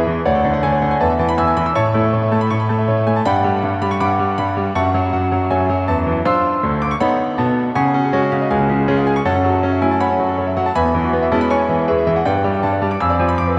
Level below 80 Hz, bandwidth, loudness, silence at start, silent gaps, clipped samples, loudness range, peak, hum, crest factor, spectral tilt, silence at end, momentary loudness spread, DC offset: -36 dBFS; 7.8 kHz; -17 LUFS; 0 s; none; under 0.1%; 1 LU; -4 dBFS; none; 14 dB; -8.5 dB/octave; 0 s; 2 LU; under 0.1%